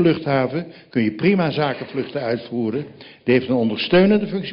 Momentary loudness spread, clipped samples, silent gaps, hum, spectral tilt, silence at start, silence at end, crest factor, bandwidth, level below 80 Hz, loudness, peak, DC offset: 11 LU; under 0.1%; none; none; -10 dB/octave; 0 s; 0 s; 14 dB; 5.6 kHz; -56 dBFS; -20 LUFS; -6 dBFS; under 0.1%